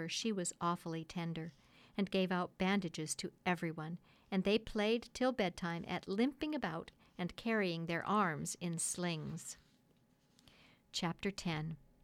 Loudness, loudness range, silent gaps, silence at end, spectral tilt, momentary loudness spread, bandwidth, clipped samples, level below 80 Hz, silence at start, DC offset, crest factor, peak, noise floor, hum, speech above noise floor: -39 LUFS; 3 LU; none; 0.25 s; -4.5 dB/octave; 11 LU; 15.5 kHz; under 0.1%; -66 dBFS; 0 s; under 0.1%; 18 dB; -22 dBFS; -72 dBFS; none; 34 dB